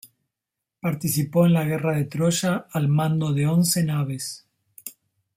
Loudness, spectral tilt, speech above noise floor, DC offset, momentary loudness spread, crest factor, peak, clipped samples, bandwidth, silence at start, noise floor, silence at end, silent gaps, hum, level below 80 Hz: -23 LUFS; -5.5 dB/octave; 64 dB; under 0.1%; 19 LU; 16 dB; -8 dBFS; under 0.1%; 16 kHz; 0.85 s; -85 dBFS; 0.45 s; none; none; -60 dBFS